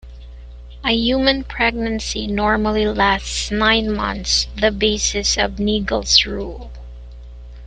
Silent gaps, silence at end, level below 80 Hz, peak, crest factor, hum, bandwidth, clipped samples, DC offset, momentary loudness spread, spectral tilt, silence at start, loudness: none; 0 s; -32 dBFS; 0 dBFS; 20 dB; 60 Hz at -30 dBFS; 9.4 kHz; under 0.1%; under 0.1%; 12 LU; -3 dB/octave; 0.05 s; -18 LUFS